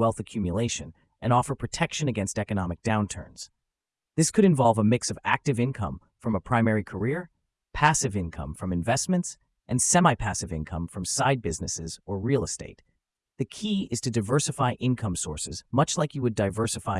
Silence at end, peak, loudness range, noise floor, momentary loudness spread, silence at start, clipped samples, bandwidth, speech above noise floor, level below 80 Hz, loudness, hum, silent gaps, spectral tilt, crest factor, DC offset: 0 s; -4 dBFS; 4 LU; -88 dBFS; 13 LU; 0 s; under 0.1%; 12 kHz; 62 dB; -50 dBFS; -26 LUFS; none; none; -5 dB/octave; 22 dB; under 0.1%